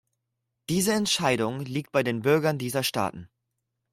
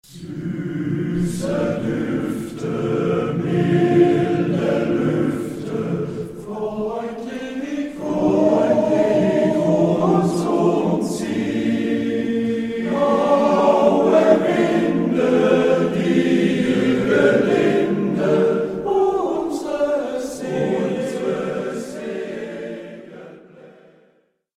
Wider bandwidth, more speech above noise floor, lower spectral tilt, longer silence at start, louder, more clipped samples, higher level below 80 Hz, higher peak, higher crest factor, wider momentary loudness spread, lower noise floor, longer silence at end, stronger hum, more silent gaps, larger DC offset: first, 16 kHz vs 13.5 kHz; first, 56 dB vs 42 dB; second, -4 dB/octave vs -7 dB/octave; first, 0.7 s vs 0.1 s; second, -26 LUFS vs -19 LUFS; neither; second, -64 dBFS vs -52 dBFS; second, -8 dBFS vs 0 dBFS; about the same, 18 dB vs 18 dB; second, 8 LU vs 12 LU; first, -81 dBFS vs -61 dBFS; second, 0.65 s vs 0.9 s; neither; neither; neither